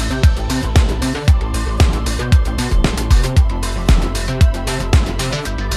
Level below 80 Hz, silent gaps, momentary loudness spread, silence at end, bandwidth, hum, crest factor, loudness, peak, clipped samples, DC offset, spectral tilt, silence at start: -16 dBFS; none; 5 LU; 0 s; 14.5 kHz; none; 14 dB; -17 LUFS; -2 dBFS; under 0.1%; under 0.1%; -5.5 dB/octave; 0 s